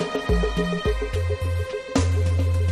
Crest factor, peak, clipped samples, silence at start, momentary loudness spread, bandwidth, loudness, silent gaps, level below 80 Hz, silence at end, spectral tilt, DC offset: 14 dB; -8 dBFS; under 0.1%; 0 s; 4 LU; 12 kHz; -24 LUFS; none; -30 dBFS; 0 s; -6.5 dB/octave; under 0.1%